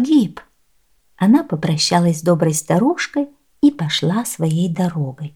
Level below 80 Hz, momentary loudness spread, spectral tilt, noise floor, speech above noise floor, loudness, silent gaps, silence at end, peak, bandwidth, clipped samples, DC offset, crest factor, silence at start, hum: -58 dBFS; 7 LU; -5.5 dB/octave; -63 dBFS; 46 dB; -17 LUFS; none; 0.05 s; -2 dBFS; 17 kHz; under 0.1%; 0.1%; 16 dB; 0 s; none